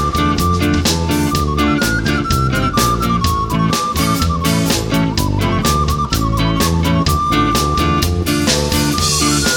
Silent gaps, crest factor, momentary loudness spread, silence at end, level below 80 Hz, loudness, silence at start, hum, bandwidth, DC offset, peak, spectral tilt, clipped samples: none; 14 dB; 2 LU; 0 s; -24 dBFS; -15 LUFS; 0 s; none; 19 kHz; under 0.1%; 0 dBFS; -4.5 dB/octave; under 0.1%